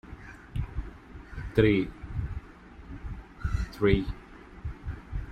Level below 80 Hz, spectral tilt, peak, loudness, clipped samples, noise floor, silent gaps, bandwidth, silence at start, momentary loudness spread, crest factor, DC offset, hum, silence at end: -38 dBFS; -8 dB/octave; -8 dBFS; -30 LUFS; under 0.1%; -48 dBFS; none; 12.5 kHz; 0.05 s; 22 LU; 22 dB; under 0.1%; none; 0 s